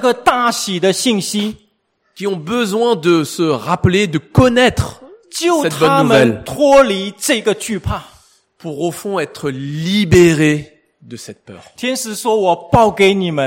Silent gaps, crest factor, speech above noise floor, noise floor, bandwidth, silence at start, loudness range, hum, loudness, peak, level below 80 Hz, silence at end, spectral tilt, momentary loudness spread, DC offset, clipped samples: none; 14 dB; 49 dB; -63 dBFS; 16.5 kHz; 0 s; 4 LU; none; -14 LUFS; 0 dBFS; -40 dBFS; 0 s; -5 dB/octave; 13 LU; under 0.1%; under 0.1%